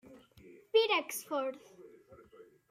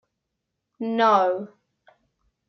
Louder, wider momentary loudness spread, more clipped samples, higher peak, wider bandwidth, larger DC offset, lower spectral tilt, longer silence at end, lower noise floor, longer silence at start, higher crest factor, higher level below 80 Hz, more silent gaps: second, -32 LUFS vs -22 LUFS; second, 12 LU vs 16 LU; neither; second, -16 dBFS vs -6 dBFS; first, 16 kHz vs 6.4 kHz; neither; second, -1.5 dB/octave vs -5.5 dB/octave; second, 0.3 s vs 1 s; second, -59 dBFS vs -81 dBFS; second, 0.1 s vs 0.8 s; about the same, 20 dB vs 20 dB; about the same, -78 dBFS vs -78 dBFS; neither